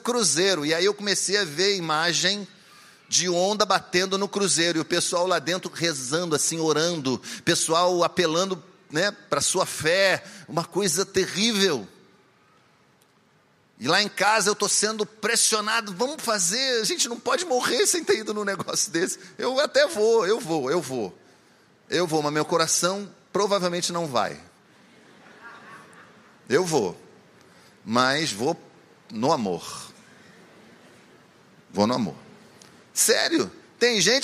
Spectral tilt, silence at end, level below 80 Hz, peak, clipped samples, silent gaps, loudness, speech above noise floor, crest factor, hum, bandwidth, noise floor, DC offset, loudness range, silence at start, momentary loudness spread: -2.5 dB/octave; 0 s; -70 dBFS; -4 dBFS; under 0.1%; none; -23 LUFS; 37 dB; 20 dB; none; 15 kHz; -61 dBFS; under 0.1%; 7 LU; 0.05 s; 10 LU